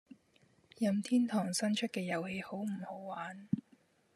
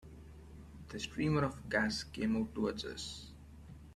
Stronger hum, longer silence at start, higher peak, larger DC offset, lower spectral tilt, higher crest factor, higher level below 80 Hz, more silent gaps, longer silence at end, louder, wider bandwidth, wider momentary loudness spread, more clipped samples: neither; about the same, 0.1 s vs 0 s; about the same, -18 dBFS vs -18 dBFS; neither; about the same, -5 dB/octave vs -5 dB/octave; about the same, 18 dB vs 20 dB; second, -80 dBFS vs -56 dBFS; neither; first, 0.55 s vs 0 s; about the same, -36 LUFS vs -37 LUFS; about the same, 13.5 kHz vs 13.5 kHz; second, 11 LU vs 21 LU; neither